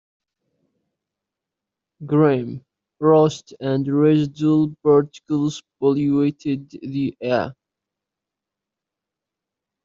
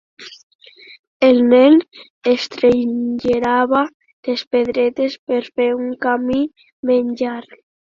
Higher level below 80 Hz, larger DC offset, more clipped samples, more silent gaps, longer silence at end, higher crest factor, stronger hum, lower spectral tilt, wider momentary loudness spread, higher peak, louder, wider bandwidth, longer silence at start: second, -62 dBFS vs -54 dBFS; neither; neither; second, none vs 0.43-0.59 s, 0.99-1.20 s, 2.10-2.21 s, 3.94-4.00 s, 4.13-4.23 s, 4.47-4.51 s, 5.19-5.27 s, 6.72-6.83 s; first, 2.35 s vs 0.55 s; about the same, 18 dB vs 16 dB; neither; first, -7.5 dB/octave vs -5.5 dB/octave; about the same, 12 LU vs 14 LU; about the same, -4 dBFS vs -2 dBFS; second, -20 LUFS vs -17 LUFS; about the same, 7.6 kHz vs 7.2 kHz; first, 2 s vs 0.2 s